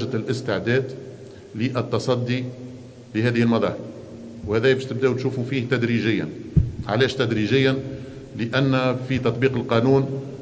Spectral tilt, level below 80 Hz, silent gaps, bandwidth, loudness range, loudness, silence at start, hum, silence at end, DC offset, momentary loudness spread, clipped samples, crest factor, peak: -7 dB/octave; -42 dBFS; none; 8 kHz; 3 LU; -22 LUFS; 0 s; none; 0 s; under 0.1%; 16 LU; under 0.1%; 18 dB; -4 dBFS